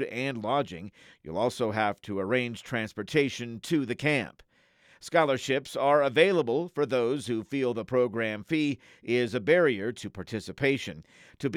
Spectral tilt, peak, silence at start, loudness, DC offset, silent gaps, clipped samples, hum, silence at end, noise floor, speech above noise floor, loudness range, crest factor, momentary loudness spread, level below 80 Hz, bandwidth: -5.5 dB/octave; -8 dBFS; 0 s; -28 LUFS; under 0.1%; none; under 0.1%; none; 0 s; -62 dBFS; 34 dB; 4 LU; 20 dB; 14 LU; -68 dBFS; 15 kHz